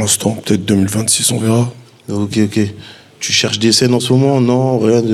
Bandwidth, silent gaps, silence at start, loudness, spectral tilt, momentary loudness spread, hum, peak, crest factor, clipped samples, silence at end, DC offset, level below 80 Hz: 15.5 kHz; none; 0 s; -13 LUFS; -4.5 dB/octave; 10 LU; none; 0 dBFS; 12 dB; under 0.1%; 0 s; under 0.1%; -52 dBFS